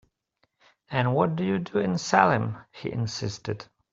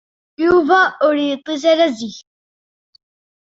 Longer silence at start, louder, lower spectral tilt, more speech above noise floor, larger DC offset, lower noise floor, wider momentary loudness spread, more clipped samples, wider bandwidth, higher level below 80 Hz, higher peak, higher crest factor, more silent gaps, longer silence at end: first, 0.9 s vs 0.4 s; second, -26 LUFS vs -15 LUFS; first, -6 dB/octave vs -4 dB/octave; second, 48 dB vs over 75 dB; neither; second, -73 dBFS vs under -90 dBFS; first, 14 LU vs 9 LU; neither; about the same, 7.8 kHz vs 7.8 kHz; second, -60 dBFS vs -54 dBFS; about the same, -2 dBFS vs -2 dBFS; first, 24 dB vs 16 dB; neither; second, 0.3 s vs 1.25 s